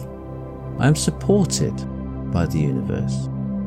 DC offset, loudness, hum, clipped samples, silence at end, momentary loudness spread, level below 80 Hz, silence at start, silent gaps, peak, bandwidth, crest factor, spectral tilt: under 0.1%; -22 LUFS; none; under 0.1%; 0 s; 14 LU; -38 dBFS; 0 s; none; -4 dBFS; 15 kHz; 18 dB; -6 dB/octave